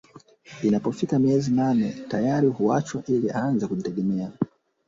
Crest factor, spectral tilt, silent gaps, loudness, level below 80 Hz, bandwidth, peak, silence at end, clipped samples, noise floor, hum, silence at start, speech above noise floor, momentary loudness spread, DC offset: 16 dB; -7.5 dB/octave; none; -24 LUFS; -60 dBFS; 7.8 kHz; -10 dBFS; 0.4 s; under 0.1%; -49 dBFS; none; 0.15 s; 26 dB; 7 LU; under 0.1%